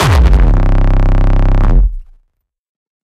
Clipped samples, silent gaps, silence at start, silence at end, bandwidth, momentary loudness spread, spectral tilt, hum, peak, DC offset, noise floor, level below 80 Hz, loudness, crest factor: 0.3%; none; 0 s; 1 s; 10 kHz; 6 LU; -6.5 dB/octave; none; 0 dBFS; under 0.1%; -61 dBFS; -10 dBFS; -13 LUFS; 10 dB